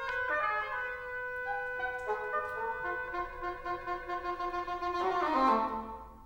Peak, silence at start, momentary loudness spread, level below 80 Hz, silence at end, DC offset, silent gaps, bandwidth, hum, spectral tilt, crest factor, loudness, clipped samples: -16 dBFS; 0 s; 10 LU; -56 dBFS; 0 s; under 0.1%; none; 16 kHz; none; -5 dB/octave; 18 dB; -34 LUFS; under 0.1%